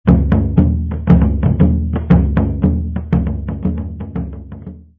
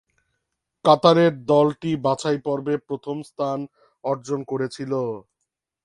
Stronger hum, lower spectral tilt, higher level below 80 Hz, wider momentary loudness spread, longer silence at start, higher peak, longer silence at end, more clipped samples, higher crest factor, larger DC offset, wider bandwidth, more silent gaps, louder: neither; first, -12 dB/octave vs -6.5 dB/octave; first, -20 dBFS vs -64 dBFS; about the same, 13 LU vs 14 LU; second, 0.05 s vs 0.85 s; about the same, 0 dBFS vs 0 dBFS; second, 0.2 s vs 0.65 s; neither; second, 14 dB vs 22 dB; neither; second, 3.7 kHz vs 11.5 kHz; neither; first, -16 LUFS vs -22 LUFS